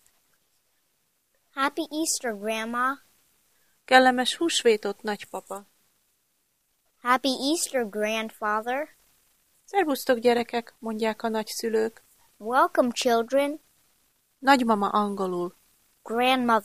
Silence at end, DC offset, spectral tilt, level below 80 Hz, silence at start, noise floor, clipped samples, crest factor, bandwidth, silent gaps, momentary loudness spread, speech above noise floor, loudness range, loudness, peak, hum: 0 s; under 0.1%; -3 dB/octave; -70 dBFS; 1.55 s; -72 dBFS; under 0.1%; 24 dB; 15.5 kHz; none; 13 LU; 47 dB; 5 LU; -25 LUFS; -4 dBFS; none